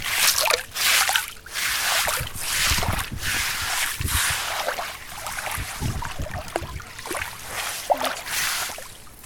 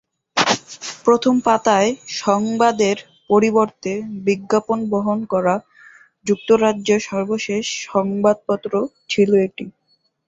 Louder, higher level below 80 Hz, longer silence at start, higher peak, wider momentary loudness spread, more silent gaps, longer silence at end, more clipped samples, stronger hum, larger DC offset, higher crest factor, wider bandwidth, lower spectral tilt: second, -23 LUFS vs -19 LUFS; first, -40 dBFS vs -60 dBFS; second, 0 s vs 0.35 s; about the same, 0 dBFS vs -2 dBFS; first, 13 LU vs 8 LU; neither; second, 0 s vs 0.55 s; neither; neither; neither; first, 26 dB vs 16 dB; first, 18 kHz vs 8 kHz; second, -1 dB/octave vs -4.5 dB/octave